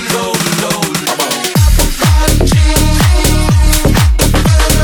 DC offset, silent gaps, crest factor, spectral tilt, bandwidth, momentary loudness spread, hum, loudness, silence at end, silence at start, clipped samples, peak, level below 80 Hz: 1%; none; 10 dB; -4.5 dB/octave; over 20 kHz; 4 LU; none; -11 LUFS; 0 s; 0 s; under 0.1%; 0 dBFS; -12 dBFS